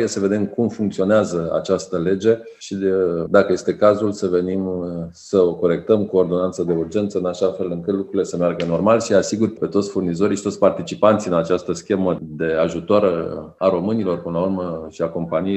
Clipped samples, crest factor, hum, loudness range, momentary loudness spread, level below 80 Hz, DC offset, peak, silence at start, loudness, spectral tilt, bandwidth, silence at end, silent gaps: under 0.1%; 20 dB; none; 2 LU; 7 LU; -58 dBFS; under 0.1%; 0 dBFS; 0 s; -20 LUFS; -6.5 dB/octave; 8.8 kHz; 0 s; none